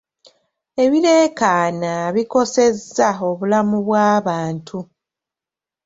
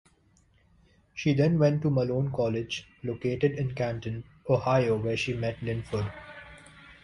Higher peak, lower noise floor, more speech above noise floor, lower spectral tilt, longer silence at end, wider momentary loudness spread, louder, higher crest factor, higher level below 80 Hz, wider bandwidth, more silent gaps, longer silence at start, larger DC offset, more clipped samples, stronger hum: first, -2 dBFS vs -10 dBFS; first, -89 dBFS vs -64 dBFS; first, 72 dB vs 37 dB; second, -5 dB/octave vs -7 dB/octave; first, 1 s vs 0.1 s; second, 11 LU vs 16 LU; first, -17 LUFS vs -28 LUFS; about the same, 16 dB vs 18 dB; second, -60 dBFS vs -54 dBFS; second, 7.8 kHz vs 11 kHz; neither; second, 0.75 s vs 1.15 s; neither; neither; neither